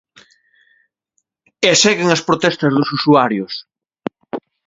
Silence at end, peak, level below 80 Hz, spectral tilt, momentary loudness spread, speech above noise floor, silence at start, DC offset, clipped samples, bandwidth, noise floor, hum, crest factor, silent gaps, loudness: 0.3 s; 0 dBFS; -60 dBFS; -3.5 dB/octave; 18 LU; 56 dB; 1.6 s; under 0.1%; under 0.1%; 7.8 kHz; -70 dBFS; none; 18 dB; none; -14 LUFS